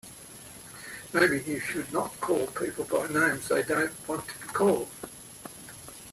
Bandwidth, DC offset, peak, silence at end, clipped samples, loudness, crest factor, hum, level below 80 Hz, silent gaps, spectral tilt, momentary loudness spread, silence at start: 15.5 kHz; under 0.1%; -10 dBFS; 0 s; under 0.1%; -28 LUFS; 20 dB; none; -62 dBFS; none; -4 dB/octave; 18 LU; 0.05 s